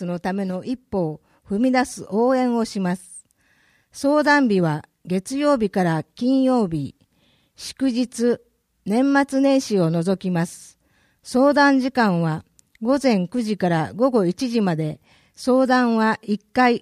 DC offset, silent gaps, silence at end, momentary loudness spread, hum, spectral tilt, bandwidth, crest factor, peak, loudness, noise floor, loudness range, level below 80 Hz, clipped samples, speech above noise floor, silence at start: under 0.1%; none; 0.05 s; 12 LU; none; -6 dB/octave; 13 kHz; 16 dB; -4 dBFS; -21 LUFS; -62 dBFS; 3 LU; -58 dBFS; under 0.1%; 42 dB; 0 s